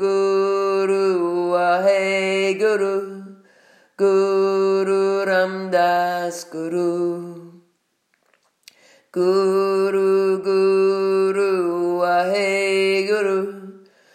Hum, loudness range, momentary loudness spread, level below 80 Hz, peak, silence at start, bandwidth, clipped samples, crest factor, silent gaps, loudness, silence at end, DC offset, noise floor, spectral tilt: none; 5 LU; 8 LU; -84 dBFS; -6 dBFS; 0 s; 14 kHz; under 0.1%; 14 dB; none; -19 LUFS; 0.4 s; under 0.1%; -68 dBFS; -5 dB/octave